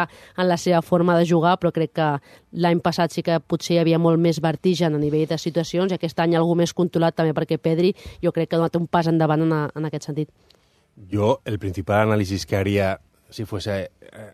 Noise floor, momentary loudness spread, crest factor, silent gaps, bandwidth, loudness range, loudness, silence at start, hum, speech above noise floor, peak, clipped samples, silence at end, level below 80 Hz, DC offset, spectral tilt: -59 dBFS; 10 LU; 18 dB; none; 14 kHz; 3 LU; -21 LUFS; 0 s; none; 38 dB; -4 dBFS; under 0.1%; 0.05 s; -56 dBFS; under 0.1%; -6.5 dB/octave